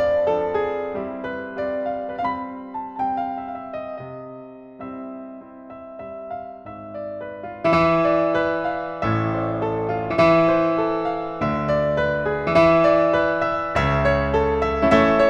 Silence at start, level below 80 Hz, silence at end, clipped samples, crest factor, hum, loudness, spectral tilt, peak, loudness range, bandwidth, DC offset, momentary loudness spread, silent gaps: 0 s; -40 dBFS; 0 s; under 0.1%; 20 dB; none; -21 LUFS; -7.5 dB/octave; -2 dBFS; 15 LU; 8.8 kHz; under 0.1%; 19 LU; none